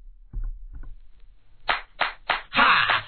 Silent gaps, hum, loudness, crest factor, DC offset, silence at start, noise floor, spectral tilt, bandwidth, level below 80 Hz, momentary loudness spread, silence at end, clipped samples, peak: none; none; -22 LUFS; 24 dB; 0.3%; 0.05 s; -48 dBFS; -5.5 dB/octave; 4.6 kHz; -38 dBFS; 23 LU; 0 s; under 0.1%; -4 dBFS